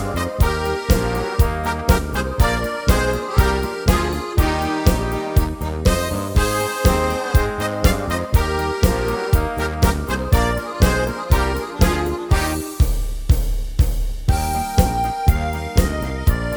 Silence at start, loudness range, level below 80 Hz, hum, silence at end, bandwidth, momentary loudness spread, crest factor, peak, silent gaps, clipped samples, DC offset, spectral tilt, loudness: 0 s; 1 LU; -22 dBFS; none; 0 s; over 20 kHz; 4 LU; 18 dB; 0 dBFS; none; under 0.1%; under 0.1%; -5.5 dB/octave; -20 LUFS